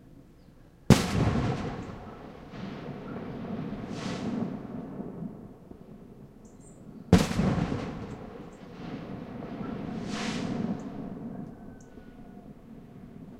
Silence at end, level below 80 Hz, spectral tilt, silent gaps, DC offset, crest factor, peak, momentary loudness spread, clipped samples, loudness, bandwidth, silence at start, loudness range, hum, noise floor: 0 s; -46 dBFS; -6 dB/octave; none; under 0.1%; 28 dB; -4 dBFS; 24 LU; under 0.1%; -31 LUFS; 16 kHz; 0 s; 8 LU; none; -54 dBFS